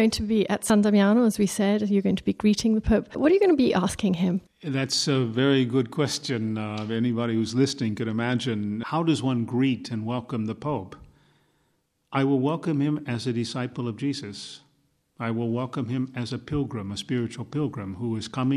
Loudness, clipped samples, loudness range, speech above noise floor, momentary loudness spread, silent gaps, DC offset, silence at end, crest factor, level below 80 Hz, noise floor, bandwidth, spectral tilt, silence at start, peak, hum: -25 LUFS; under 0.1%; 8 LU; 47 dB; 10 LU; none; under 0.1%; 0 s; 16 dB; -48 dBFS; -71 dBFS; 14.5 kHz; -6 dB/octave; 0 s; -8 dBFS; none